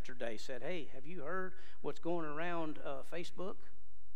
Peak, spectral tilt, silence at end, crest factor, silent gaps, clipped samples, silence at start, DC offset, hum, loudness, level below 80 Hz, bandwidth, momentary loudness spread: -22 dBFS; -5.5 dB/octave; 0.25 s; 18 dB; none; under 0.1%; 0 s; 3%; none; -44 LUFS; -68 dBFS; 14.5 kHz; 8 LU